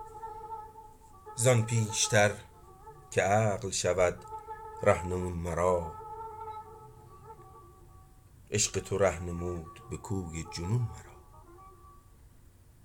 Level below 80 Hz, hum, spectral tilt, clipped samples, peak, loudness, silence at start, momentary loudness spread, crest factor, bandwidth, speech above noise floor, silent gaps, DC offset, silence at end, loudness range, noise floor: -56 dBFS; none; -4 dB/octave; under 0.1%; -10 dBFS; -30 LUFS; 0 s; 24 LU; 22 dB; 18 kHz; 28 dB; none; under 0.1%; 0.55 s; 8 LU; -57 dBFS